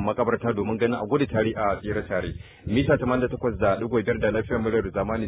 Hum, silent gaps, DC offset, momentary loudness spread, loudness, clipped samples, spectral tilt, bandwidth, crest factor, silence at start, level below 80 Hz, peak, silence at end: none; none; under 0.1%; 6 LU; -25 LUFS; under 0.1%; -11 dB/octave; 4 kHz; 16 dB; 0 s; -42 dBFS; -8 dBFS; 0 s